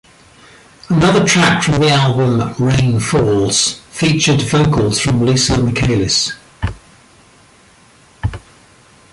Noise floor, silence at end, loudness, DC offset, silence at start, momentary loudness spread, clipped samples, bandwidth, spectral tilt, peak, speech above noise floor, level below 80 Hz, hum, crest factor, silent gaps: -47 dBFS; 0.75 s; -14 LUFS; under 0.1%; 0.9 s; 14 LU; under 0.1%; 11.5 kHz; -4.5 dB/octave; 0 dBFS; 34 dB; -34 dBFS; none; 14 dB; none